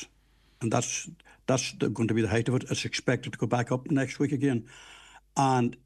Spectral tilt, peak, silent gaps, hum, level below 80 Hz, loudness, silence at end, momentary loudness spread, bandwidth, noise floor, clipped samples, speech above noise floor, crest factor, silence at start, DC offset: -5 dB/octave; -10 dBFS; none; none; -62 dBFS; -29 LUFS; 0.1 s; 12 LU; 12.5 kHz; -63 dBFS; under 0.1%; 35 dB; 18 dB; 0 s; under 0.1%